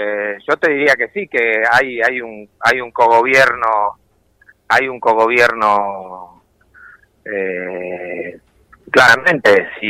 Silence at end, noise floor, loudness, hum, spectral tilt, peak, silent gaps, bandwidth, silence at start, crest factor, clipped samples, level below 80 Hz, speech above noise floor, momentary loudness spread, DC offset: 0 s; -52 dBFS; -14 LUFS; none; -3.5 dB/octave; 0 dBFS; none; 16 kHz; 0 s; 14 dB; under 0.1%; -54 dBFS; 37 dB; 15 LU; under 0.1%